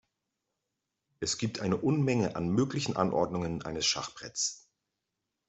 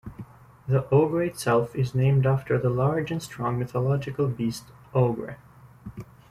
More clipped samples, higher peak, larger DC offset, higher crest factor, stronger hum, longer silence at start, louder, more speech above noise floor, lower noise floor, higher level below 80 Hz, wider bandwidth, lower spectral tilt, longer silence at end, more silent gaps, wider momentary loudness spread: neither; second, -12 dBFS vs -8 dBFS; neither; about the same, 22 dB vs 18 dB; neither; first, 1.2 s vs 0.05 s; second, -31 LUFS vs -25 LUFS; first, 55 dB vs 20 dB; first, -86 dBFS vs -45 dBFS; second, -62 dBFS vs -54 dBFS; second, 8.2 kHz vs 13.5 kHz; second, -4.5 dB/octave vs -7.5 dB/octave; first, 0.9 s vs 0.25 s; neither; second, 7 LU vs 20 LU